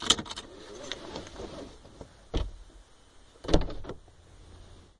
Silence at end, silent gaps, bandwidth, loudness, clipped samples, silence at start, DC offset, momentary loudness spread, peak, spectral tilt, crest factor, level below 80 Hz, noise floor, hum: 0.15 s; none; 11.5 kHz; -34 LUFS; under 0.1%; 0 s; under 0.1%; 23 LU; -4 dBFS; -3 dB/octave; 30 dB; -40 dBFS; -56 dBFS; none